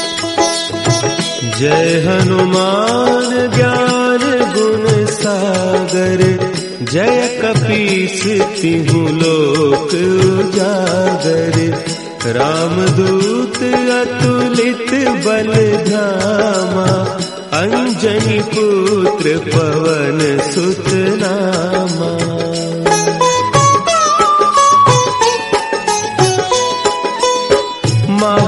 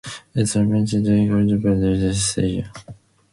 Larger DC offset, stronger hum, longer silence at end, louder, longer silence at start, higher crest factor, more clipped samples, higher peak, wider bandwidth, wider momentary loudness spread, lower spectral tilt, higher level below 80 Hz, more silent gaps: first, 0.1% vs under 0.1%; neither; second, 0 s vs 0.4 s; first, -13 LUFS vs -19 LUFS; about the same, 0 s vs 0.05 s; about the same, 12 dB vs 12 dB; neither; first, 0 dBFS vs -8 dBFS; about the same, 11.5 kHz vs 11.5 kHz; second, 5 LU vs 10 LU; second, -4.5 dB/octave vs -6 dB/octave; second, -46 dBFS vs -40 dBFS; neither